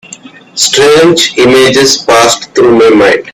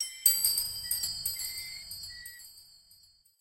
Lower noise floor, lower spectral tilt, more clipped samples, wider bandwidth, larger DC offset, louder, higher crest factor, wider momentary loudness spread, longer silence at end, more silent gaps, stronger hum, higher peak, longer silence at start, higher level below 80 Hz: second, -31 dBFS vs -62 dBFS; first, -3 dB/octave vs 2.5 dB/octave; first, 0.9% vs under 0.1%; first, over 20 kHz vs 17 kHz; neither; first, -5 LUFS vs -29 LUFS; second, 6 dB vs 28 dB; second, 4 LU vs 21 LU; second, 0 s vs 0.45 s; neither; neither; first, 0 dBFS vs -6 dBFS; first, 0.55 s vs 0 s; first, -42 dBFS vs -62 dBFS